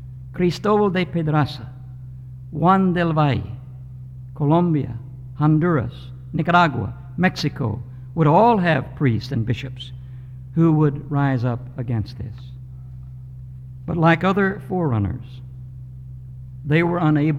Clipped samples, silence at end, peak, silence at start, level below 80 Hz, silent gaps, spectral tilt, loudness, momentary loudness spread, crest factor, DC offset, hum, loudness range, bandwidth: under 0.1%; 0 s; -4 dBFS; 0 s; -44 dBFS; none; -8 dB/octave; -20 LUFS; 21 LU; 16 dB; under 0.1%; none; 3 LU; 7.8 kHz